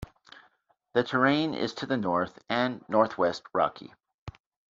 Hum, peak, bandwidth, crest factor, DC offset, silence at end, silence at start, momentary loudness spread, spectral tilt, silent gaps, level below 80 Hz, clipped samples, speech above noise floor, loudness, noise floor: none; -8 dBFS; 7.6 kHz; 20 dB; under 0.1%; 0.4 s; 0 s; 23 LU; -3.5 dB/octave; 4.14-4.26 s; -60 dBFS; under 0.1%; 40 dB; -28 LUFS; -68 dBFS